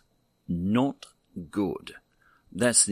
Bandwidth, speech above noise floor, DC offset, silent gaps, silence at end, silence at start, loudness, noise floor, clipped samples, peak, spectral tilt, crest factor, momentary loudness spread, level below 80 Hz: 15.5 kHz; 37 dB; under 0.1%; none; 0 s; 0.5 s; -27 LUFS; -63 dBFS; under 0.1%; -6 dBFS; -3.5 dB/octave; 24 dB; 22 LU; -60 dBFS